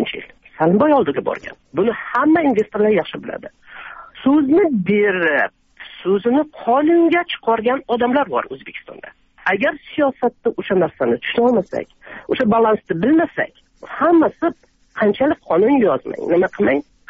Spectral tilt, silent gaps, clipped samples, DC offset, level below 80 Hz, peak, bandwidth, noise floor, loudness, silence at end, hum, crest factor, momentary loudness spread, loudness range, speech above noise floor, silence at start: -4.5 dB/octave; none; under 0.1%; under 0.1%; -54 dBFS; -4 dBFS; 6.2 kHz; -37 dBFS; -17 LUFS; 0.3 s; none; 14 dB; 17 LU; 3 LU; 20 dB; 0 s